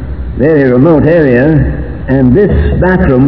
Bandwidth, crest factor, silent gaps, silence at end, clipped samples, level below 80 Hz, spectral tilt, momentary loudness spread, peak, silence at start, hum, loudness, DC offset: 5.4 kHz; 8 dB; none; 0 s; 3%; -18 dBFS; -11.5 dB/octave; 7 LU; 0 dBFS; 0 s; none; -8 LUFS; 3%